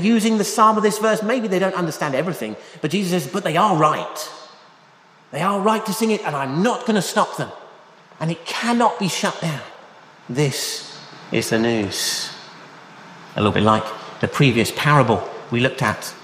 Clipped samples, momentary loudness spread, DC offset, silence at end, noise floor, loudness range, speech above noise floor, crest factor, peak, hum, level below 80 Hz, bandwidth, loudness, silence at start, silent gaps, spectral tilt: under 0.1%; 15 LU; under 0.1%; 0 s; -50 dBFS; 4 LU; 31 dB; 20 dB; -2 dBFS; none; -58 dBFS; 15.5 kHz; -20 LUFS; 0 s; none; -5 dB/octave